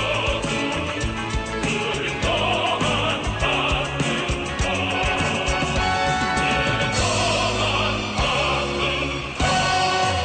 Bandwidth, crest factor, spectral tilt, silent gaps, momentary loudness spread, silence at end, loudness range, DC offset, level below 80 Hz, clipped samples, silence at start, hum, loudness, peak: 9.6 kHz; 12 dB; -4 dB/octave; none; 4 LU; 0 s; 2 LU; under 0.1%; -34 dBFS; under 0.1%; 0 s; none; -21 LUFS; -10 dBFS